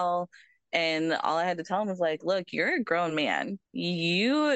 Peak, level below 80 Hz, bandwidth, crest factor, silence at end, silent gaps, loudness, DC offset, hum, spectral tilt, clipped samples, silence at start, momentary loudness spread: -10 dBFS; -78 dBFS; 9 kHz; 18 dB; 0 s; none; -28 LUFS; under 0.1%; none; -5 dB/octave; under 0.1%; 0 s; 6 LU